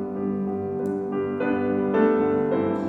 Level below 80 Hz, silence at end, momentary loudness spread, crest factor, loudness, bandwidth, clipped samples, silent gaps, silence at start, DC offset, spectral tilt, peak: -58 dBFS; 0 s; 7 LU; 16 dB; -24 LUFS; 4.5 kHz; under 0.1%; none; 0 s; under 0.1%; -9.5 dB/octave; -8 dBFS